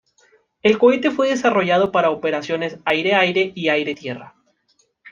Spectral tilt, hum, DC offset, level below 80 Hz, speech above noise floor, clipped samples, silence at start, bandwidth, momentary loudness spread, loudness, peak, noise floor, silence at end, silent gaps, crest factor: -5 dB/octave; none; under 0.1%; -62 dBFS; 46 dB; under 0.1%; 0.65 s; 7.4 kHz; 10 LU; -18 LUFS; -2 dBFS; -64 dBFS; 0 s; none; 18 dB